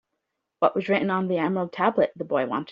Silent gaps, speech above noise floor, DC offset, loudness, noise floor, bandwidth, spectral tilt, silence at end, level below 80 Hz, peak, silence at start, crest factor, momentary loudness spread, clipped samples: none; 57 dB; under 0.1%; -24 LUFS; -80 dBFS; 5.6 kHz; -5 dB/octave; 0 s; -68 dBFS; -6 dBFS; 0.6 s; 20 dB; 3 LU; under 0.1%